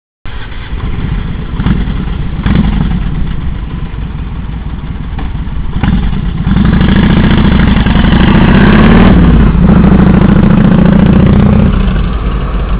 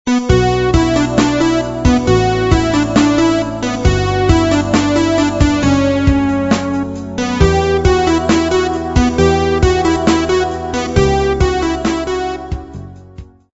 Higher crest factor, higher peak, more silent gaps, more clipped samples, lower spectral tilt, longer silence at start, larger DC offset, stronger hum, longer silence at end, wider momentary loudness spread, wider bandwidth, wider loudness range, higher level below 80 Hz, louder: second, 8 dB vs 14 dB; about the same, 0 dBFS vs 0 dBFS; neither; first, 4% vs under 0.1%; first, -11.5 dB/octave vs -6 dB/octave; first, 0.25 s vs 0.05 s; neither; neither; second, 0 s vs 0.3 s; first, 15 LU vs 7 LU; second, 4 kHz vs 8 kHz; first, 11 LU vs 2 LU; first, -12 dBFS vs -24 dBFS; first, -8 LUFS vs -14 LUFS